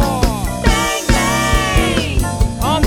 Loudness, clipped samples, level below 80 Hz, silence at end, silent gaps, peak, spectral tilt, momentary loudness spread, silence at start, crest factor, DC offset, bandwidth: -16 LUFS; under 0.1%; -20 dBFS; 0 s; none; 0 dBFS; -4.5 dB/octave; 4 LU; 0 s; 14 dB; under 0.1%; 18.5 kHz